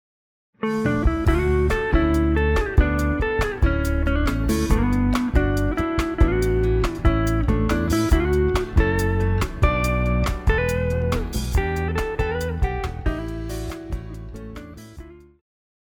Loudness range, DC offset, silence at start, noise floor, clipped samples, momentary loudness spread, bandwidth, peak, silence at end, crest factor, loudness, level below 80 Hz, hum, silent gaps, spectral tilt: 6 LU; under 0.1%; 0.6 s; -42 dBFS; under 0.1%; 10 LU; 19.5 kHz; -4 dBFS; 0.75 s; 16 dB; -22 LUFS; -24 dBFS; none; none; -7 dB/octave